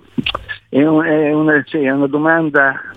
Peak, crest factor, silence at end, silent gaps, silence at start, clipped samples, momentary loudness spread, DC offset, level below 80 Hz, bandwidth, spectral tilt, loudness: 0 dBFS; 14 dB; 0 s; none; 0.2 s; under 0.1%; 8 LU; under 0.1%; -46 dBFS; 4.8 kHz; -8 dB/octave; -14 LUFS